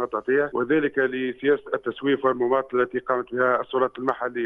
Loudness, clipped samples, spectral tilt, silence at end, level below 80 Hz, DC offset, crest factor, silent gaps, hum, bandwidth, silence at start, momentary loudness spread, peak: -24 LUFS; under 0.1%; -8 dB/octave; 0 s; -64 dBFS; under 0.1%; 18 dB; none; none; 3.9 kHz; 0 s; 4 LU; -6 dBFS